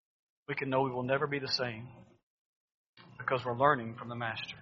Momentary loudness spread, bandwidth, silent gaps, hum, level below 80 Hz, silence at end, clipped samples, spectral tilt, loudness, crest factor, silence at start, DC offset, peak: 13 LU; 7.2 kHz; 2.23-2.68 s, 2.74-2.94 s; none; -72 dBFS; 0 s; under 0.1%; -3 dB/octave; -33 LUFS; 24 dB; 0.5 s; under 0.1%; -12 dBFS